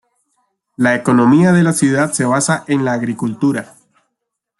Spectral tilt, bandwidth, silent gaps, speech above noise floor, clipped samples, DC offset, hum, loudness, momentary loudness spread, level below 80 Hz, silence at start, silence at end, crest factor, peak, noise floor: -5.5 dB/octave; 12 kHz; none; 63 dB; under 0.1%; under 0.1%; none; -14 LUFS; 8 LU; -56 dBFS; 0.8 s; 0.95 s; 14 dB; -2 dBFS; -76 dBFS